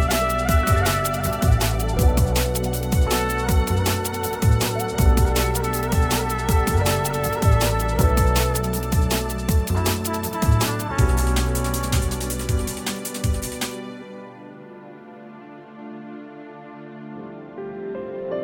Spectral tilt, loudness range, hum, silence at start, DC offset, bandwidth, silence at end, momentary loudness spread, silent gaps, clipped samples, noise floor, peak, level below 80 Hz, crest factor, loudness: -5 dB/octave; 15 LU; none; 0 s; under 0.1%; over 20 kHz; 0 s; 20 LU; none; under 0.1%; -41 dBFS; -4 dBFS; -26 dBFS; 16 dB; -21 LUFS